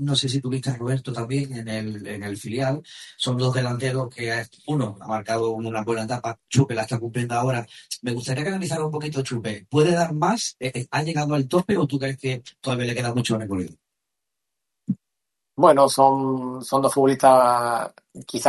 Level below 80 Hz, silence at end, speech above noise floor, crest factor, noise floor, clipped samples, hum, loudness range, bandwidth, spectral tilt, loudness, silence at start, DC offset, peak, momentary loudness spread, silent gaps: -62 dBFS; 0 s; 61 dB; 22 dB; -83 dBFS; under 0.1%; none; 8 LU; 12.5 kHz; -5.5 dB/octave; -23 LUFS; 0 s; under 0.1%; -2 dBFS; 14 LU; none